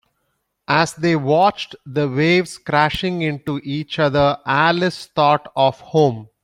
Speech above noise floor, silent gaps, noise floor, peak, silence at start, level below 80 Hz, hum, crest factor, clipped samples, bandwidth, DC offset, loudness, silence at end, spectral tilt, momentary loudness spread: 53 dB; none; -71 dBFS; -2 dBFS; 0.7 s; -50 dBFS; none; 16 dB; under 0.1%; 16 kHz; under 0.1%; -18 LUFS; 0.2 s; -6 dB/octave; 8 LU